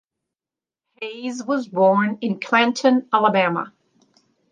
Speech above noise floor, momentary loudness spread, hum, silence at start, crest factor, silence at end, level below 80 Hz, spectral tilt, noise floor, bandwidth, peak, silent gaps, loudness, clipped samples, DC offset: over 71 dB; 13 LU; none; 1 s; 20 dB; 0.85 s; -76 dBFS; -5.5 dB/octave; under -90 dBFS; 9.2 kHz; -2 dBFS; none; -19 LUFS; under 0.1%; under 0.1%